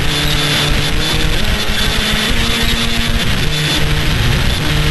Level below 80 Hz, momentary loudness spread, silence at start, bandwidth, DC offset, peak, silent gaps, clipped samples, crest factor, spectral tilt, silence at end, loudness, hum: -20 dBFS; 2 LU; 0 s; 12.5 kHz; under 0.1%; -2 dBFS; none; under 0.1%; 12 dB; -3.5 dB/octave; 0 s; -14 LUFS; none